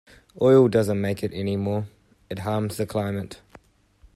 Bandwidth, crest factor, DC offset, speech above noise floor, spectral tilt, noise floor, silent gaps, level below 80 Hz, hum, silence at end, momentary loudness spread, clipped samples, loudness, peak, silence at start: 14 kHz; 18 dB; under 0.1%; 34 dB; -7.5 dB/octave; -57 dBFS; none; -58 dBFS; none; 0.8 s; 16 LU; under 0.1%; -23 LUFS; -6 dBFS; 0.4 s